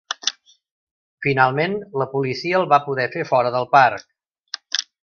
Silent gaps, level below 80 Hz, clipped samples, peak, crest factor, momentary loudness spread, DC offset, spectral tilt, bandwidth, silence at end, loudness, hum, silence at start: 0.71-1.18 s, 4.39-4.44 s; -64 dBFS; under 0.1%; 0 dBFS; 20 dB; 10 LU; under 0.1%; -4 dB/octave; 7 kHz; 0.2 s; -19 LUFS; none; 0.1 s